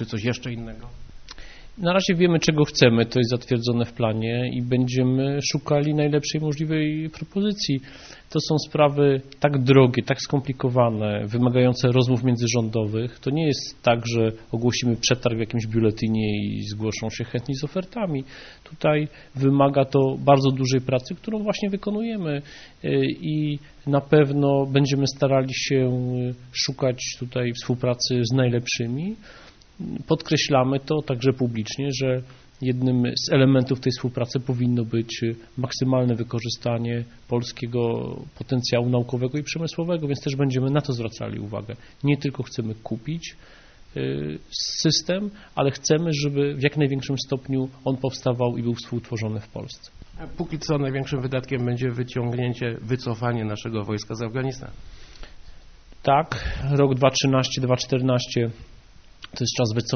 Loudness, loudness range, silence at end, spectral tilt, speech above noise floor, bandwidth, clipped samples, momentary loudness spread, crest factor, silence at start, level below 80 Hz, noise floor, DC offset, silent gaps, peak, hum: -23 LUFS; 6 LU; 0 s; -5.5 dB/octave; 24 dB; 6.6 kHz; under 0.1%; 11 LU; 22 dB; 0 s; -48 dBFS; -47 dBFS; under 0.1%; none; -2 dBFS; none